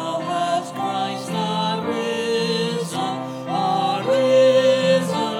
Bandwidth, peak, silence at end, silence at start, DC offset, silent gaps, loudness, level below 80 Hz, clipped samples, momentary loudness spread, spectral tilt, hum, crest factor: 15 kHz; -6 dBFS; 0 s; 0 s; under 0.1%; none; -20 LUFS; -74 dBFS; under 0.1%; 10 LU; -5 dB/octave; none; 14 dB